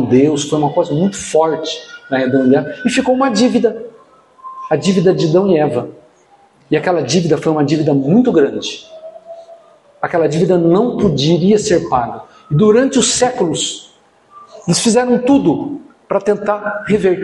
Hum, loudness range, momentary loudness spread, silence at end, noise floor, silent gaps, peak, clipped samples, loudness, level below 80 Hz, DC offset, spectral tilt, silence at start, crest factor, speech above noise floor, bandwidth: none; 3 LU; 14 LU; 0 s; -49 dBFS; none; 0 dBFS; under 0.1%; -14 LUFS; -50 dBFS; under 0.1%; -5 dB/octave; 0 s; 14 dB; 36 dB; 11.5 kHz